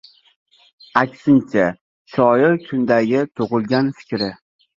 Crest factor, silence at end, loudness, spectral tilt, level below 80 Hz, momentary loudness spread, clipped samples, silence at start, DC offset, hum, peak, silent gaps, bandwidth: 18 dB; 0.4 s; -18 LUFS; -7.5 dB/octave; -58 dBFS; 9 LU; under 0.1%; 0.95 s; under 0.1%; none; 0 dBFS; 1.81-2.05 s; 7.4 kHz